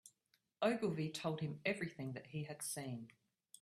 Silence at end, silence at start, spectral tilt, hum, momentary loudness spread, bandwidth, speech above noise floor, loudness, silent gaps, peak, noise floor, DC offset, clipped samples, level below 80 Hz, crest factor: 0.55 s; 0.05 s; -5 dB/octave; none; 10 LU; 15 kHz; 39 dB; -42 LUFS; none; -22 dBFS; -81 dBFS; under 0.1%; under 0.1%; -80 dBFS; 22 dB